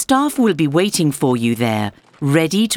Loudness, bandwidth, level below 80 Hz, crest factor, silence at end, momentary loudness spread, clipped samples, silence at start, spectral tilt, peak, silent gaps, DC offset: -17 LUFS; 19 kHz; -54 dBFS; 16 dB; 0 s; 6 LU; under 0.1%; 0 s; -5 dB/octave; -2 dBFS; none; under 0.1%